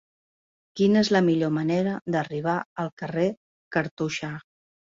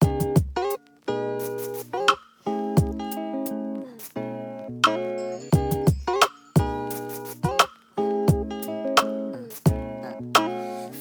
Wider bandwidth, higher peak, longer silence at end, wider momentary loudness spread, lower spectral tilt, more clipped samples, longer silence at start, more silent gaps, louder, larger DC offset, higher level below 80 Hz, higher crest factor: second, 7.6 kHz vs over 20 kHz; second, -8 dBFS vs 0 dBFS; first, 0.55 s vs 0 s; about the same, 12 LU vs 11 LU; about the same, -6.5 dB/octave vs -5.5 dB/octave; neither; first, 0.75 s vs 0 s; first, 2.02-2.06 s, 2.66-2.76 s, 2.92-2.97 s, 3.37-3.71 s, 3.91-3.97 s vs none; about the same, -25 LUFS vs -25 LUFS; neither; second, -64 dBFS vs -42 dBFS; second, 18 dB vs 24 dB